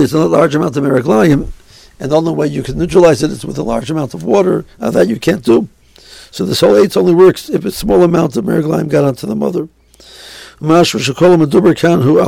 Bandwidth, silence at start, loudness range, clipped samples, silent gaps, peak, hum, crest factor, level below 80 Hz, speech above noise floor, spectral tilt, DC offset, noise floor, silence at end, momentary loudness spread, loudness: 16.5 kHz; 0 s; 3 LU; under 0.1%; none; 0 dBFS; none; 12 dB; -36 dBFS; 28 dB; -6.5 dB/octave; under 0.1%; -39 dBFS; 0 s; 12 LU; -12 LUFS